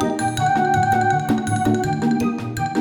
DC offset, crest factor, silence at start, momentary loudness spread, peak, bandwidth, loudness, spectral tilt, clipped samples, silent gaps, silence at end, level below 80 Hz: under 0.1%; 12 dB; 0 s; 5 LU; -6 dBFS; over 20 kHz; -20 LUFS; -6 dB/octave; under 0.1%; none; 0 s; -46 dBFS